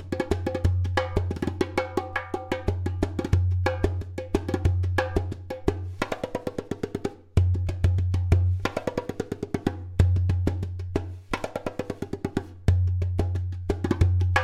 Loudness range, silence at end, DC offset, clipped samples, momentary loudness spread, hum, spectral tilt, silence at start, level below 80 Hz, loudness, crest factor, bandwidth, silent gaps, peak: 3 LU; 0 s; under 0.1%; under 0.1%; 9 LU; none; -7.5 dB/octave; 0 s; -36 dBFS; -27 LUFS; 22 dB; 10 kHz; none; -4 dBFS